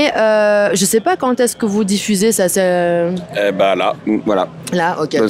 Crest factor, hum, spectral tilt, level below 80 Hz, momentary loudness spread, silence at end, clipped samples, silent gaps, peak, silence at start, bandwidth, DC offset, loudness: 12 dB; none; -4 dB/octave; -56 dBFS; 5 LU; 0 s; under 0.1%; none; -2 dBFS; 0 s; 16 kHz; under 0.1%; -15 LUFS